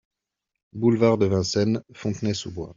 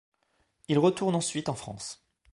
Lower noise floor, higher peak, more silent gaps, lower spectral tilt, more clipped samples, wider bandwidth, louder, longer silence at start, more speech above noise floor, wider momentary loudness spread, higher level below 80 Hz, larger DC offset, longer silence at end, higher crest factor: first, -84 dBFS vs -73 dBFS; first, -6 dBFS vs -10 dBFS; neither; first, -6.5 dB/octave vs -5 dB/octave; neither; second, 7.6 kHz vs 11.5 kHz; first, -23 LUFS vs -28 LUFS; about the same, 0.75 s vs 0.7 s; first, 61 dB vs 45 dB; second, 11 LU vs 15 LU; first, -58 dBFS vs -64 dBFS; neither; second, 0.05 s vs 0.4 s; about the same, 18 dB vs 20 dB